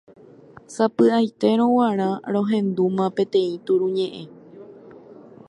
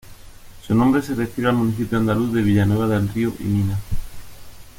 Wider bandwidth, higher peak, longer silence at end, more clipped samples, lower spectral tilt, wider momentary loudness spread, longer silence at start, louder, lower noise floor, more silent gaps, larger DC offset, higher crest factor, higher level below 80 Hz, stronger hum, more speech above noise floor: second, 11 kHz vs 17 kHz; about the same, -6 dBFS vs -4 dBFS; first, 0.35 s vs 0.05 s; neither; about the same, -7 dB/octave vs -7.5 dB/octave; about the same, 9 LU vs 7 LU; first, 0.7 s vs 0.05 s; about the same, -21 LUFS vs -20 LUFS; first, -47 dBFS vs -40 dBFS; neither; neither; about the same, 16 dB vs 16 dB; second, -70 dBFS vs -36 dBFS; neither; first, 26 dB vs 21 dB